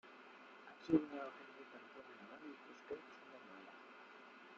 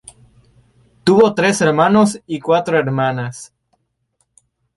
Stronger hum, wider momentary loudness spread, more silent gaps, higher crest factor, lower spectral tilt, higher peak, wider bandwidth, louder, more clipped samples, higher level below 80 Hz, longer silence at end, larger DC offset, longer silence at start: neither; first, 20 LU vs 12 LU; neither; first, 26 dB vs 16 dB; about the same, -5 dB/octave vs -5.5 dB/octave; second, -22 dBFS vs -2 dBFS; second, 7 kHz vs 11.5 kHz; second, -47 LUFS vs -15 LUFS; neither; second, -82 dBFS vs -54 dBFS; second, 0 s vs 1.3 s; neither; second, 0.05 s vs 1.05 s